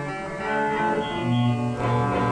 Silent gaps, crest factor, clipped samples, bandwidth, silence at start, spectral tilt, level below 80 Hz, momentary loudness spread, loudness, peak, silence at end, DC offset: none; 12 dB; under 0.1%; 10 kHz; 0 s; -7 dB/octave; -48 dBFS; 4 LU; -24 LUFS; -12 dBFS; 0 s; under 0.1%